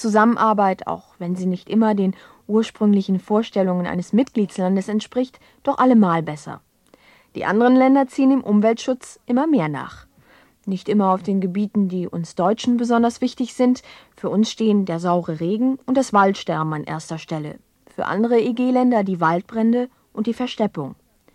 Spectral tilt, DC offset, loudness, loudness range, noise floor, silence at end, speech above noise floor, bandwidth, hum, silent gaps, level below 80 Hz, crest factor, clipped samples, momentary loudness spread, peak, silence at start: -7 dB/octave; under 0.1%; -20 LUFS; 3 LU; -54 dBFS; 0.4 s; 34 dB; 11 kHz; none; none; -62 dBFS; 16 dB; under 0.1%; 13 LU; -4 dBFS; 0 s